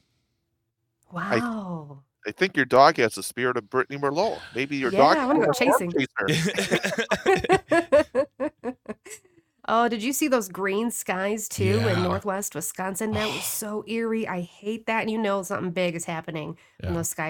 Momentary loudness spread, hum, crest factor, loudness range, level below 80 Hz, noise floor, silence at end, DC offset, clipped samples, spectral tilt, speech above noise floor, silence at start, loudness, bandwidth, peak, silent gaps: 14 LU; none; 22 dB; 6 LU; -58 dBFS; -77 dBFS; 0 s; under 0.1%; under 0.1%; -4.5 dB/octave; 52 dB; 1.1 s; -24 LUFS; 19 kHz; -2 dBFS; none